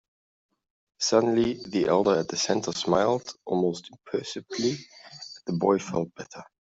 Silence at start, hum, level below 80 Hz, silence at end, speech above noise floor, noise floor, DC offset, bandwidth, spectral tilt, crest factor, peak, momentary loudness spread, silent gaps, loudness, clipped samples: 1 s; none; -62 dBFS; 0.2 s; 19 dB; -45 dBFS; under 0.1%; 8 kHz; -4.5 dB/octave; 20 dB; -6 dBFS; 16 LU; none; -26 LUFS; under 0.1%